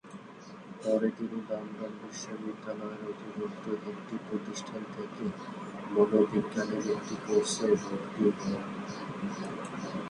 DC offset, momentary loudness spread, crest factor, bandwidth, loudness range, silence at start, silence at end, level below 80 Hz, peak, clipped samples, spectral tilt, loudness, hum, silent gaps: under 0.1%; 13 LU; 22 dB; 11 kHz; 9 LU; 0.05 s; 0 s; -70 dBFS; -12 dBFS; under 0.1%; -5.5 dB/octave; -33 LUFS; none; none